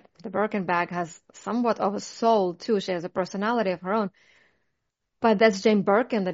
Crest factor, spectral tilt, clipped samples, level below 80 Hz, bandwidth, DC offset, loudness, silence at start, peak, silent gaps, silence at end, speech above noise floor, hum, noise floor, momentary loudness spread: 20 dB; -4.5 dB/octave; under 0.1%; -70 dBFS; 7.8 kHz; under 0.1%; -25 LUFS; 0.25 s; -6 dBFS; none; 0 s; 55 dB; none; -80 dBFS; 11 LU